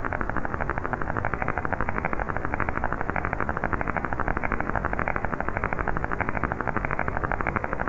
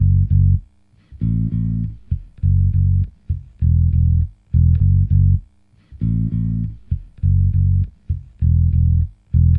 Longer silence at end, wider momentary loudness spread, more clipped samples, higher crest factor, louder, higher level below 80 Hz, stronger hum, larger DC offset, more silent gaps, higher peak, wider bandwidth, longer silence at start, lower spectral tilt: about the same, 0 s vs 0 s; second, 2 LU vs 10 LU; neither; first, 22 dB vs 12 dB; second, -28 LUFS vs -19 LUFS; second, -36 dBFS vs -24 dBFS; neither; neither; neither; about the same, -6 dBFS vs -4 dBFS; first, 7.4 kHz vs 0.5 kHz; about the same, 0 s vs 0 s; second, -8.5 dB/octave vs -13 dB/octave